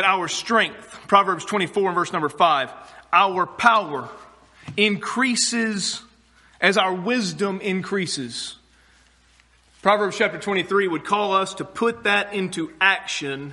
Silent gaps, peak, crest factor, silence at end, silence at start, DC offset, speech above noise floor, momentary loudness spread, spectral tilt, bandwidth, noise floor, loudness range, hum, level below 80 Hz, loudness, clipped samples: none; -2 dBFS; 22 dB; 0 s; 0 s; under 0.1%; 35 dB; 9 LU; -3 dB/octave; 11.5 kHz; -57 dBFS; 4 LU; none; -64 dBFS; -21 LUFS; under 0.1%